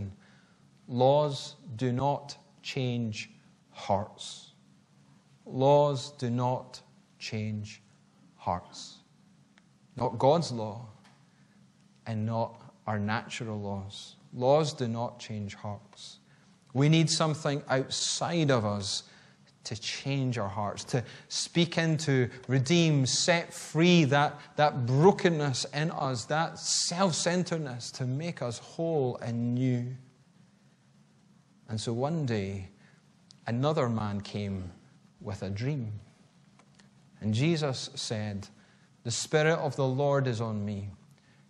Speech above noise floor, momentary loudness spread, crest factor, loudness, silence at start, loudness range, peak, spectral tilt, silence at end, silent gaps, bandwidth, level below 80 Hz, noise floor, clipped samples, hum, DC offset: 33 dB; 17 LU; 22 dB; -29 LUFS; 0 s; 10 LU; -8 dBFS; -5 dB/octave; 0.55 s; none; 11.5 kHz; -68 dBFS; -62 dBFS; under 0.1%; none; under 0.1%